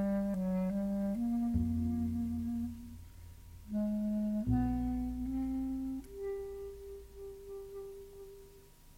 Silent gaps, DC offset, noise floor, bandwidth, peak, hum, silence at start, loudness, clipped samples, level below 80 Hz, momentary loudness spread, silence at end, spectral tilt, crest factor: none; under 0.1%; -57 dBFS; 16.5 kHz; -20 dBFS; none; 0 s; -36 LUFS; under 0.1%; -48 dBFS; 18 LU; 0 s; -9 dB/octave; 16 dB